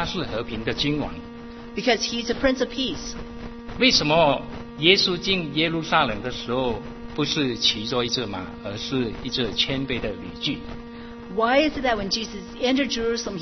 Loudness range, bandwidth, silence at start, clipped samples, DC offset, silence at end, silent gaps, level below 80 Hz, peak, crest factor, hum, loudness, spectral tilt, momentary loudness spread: 5 LU; 6.4 kHz; 0 s; under 0.1%; under 0.1%; 0 s; none; -44 dBFS; 0 dBFS; 24 dB; none; -23 LUFS; -4 dB/octave; 16 LU